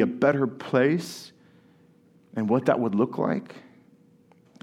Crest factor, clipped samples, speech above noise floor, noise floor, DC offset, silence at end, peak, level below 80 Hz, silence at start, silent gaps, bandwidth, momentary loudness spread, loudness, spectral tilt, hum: 20 dB; under 0.1%; 34 dB; -58 dBFS; under 0.1%; 1.05 s; -6 dBFS; -76 dBFS; 0 s; none; 15 kHz; 16 LU; -25 LUFS; -7 dB/octave; none